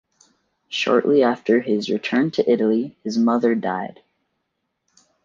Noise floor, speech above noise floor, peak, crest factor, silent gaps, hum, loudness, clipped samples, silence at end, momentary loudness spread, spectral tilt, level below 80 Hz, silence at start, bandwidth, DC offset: -76 dBFS; 56 dB; -4 dBFS; 16 dB; none; none; -20 LUFS; under 0.1%; 1.35 s; 9 LU; -5.5 dB/octave; -68 dBFS; 0.7 s; 7.4 kHz; under 0.1%